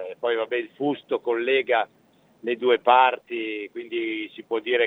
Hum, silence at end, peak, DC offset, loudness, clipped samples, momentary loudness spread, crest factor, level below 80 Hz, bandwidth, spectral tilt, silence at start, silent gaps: none; 0 s; -2 dBFS; under 0.1%; -24 LUFS; under 0.1%; 13 LU; 22 dB; -82 dBFS; 4.1 kHz; -6 dB/octave; 0 s; none